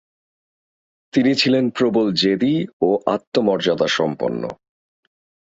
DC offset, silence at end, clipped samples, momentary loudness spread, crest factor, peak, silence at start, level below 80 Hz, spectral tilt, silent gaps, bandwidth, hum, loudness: under 0.1%; 0.85 s; under 0.1%; 7 LU; 18 dB; -2 dBFS; 1.15 s; -60 dBFS; -5.5 dB/octave; 2.73-2.80 s, 3.27-3.32 s; 7.8 kHz; none; -19 LUFS